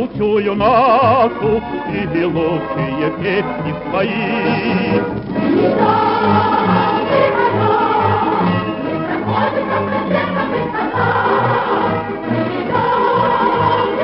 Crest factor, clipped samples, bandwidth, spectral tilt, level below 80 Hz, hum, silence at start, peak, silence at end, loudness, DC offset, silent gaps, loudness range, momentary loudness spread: 14 dB; under 0.1%; 5.8 kHz; -10.5 dB/octave; -44 dBFS; none; 0 s; 0 dBFS; 0 s; -16 LUFS; under 0.1%; none; 3 LU; 6 LU